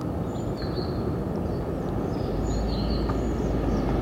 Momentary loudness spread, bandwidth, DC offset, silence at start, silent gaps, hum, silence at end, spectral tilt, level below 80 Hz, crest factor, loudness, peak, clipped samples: 4 LU; 15.5 kHz; under 0.1%; 0 s; none; none; 0 s; -7.5 dB/octave; -32 dBFS; 14 dB; -28 LUFS; -14 dBFS; under 0.1%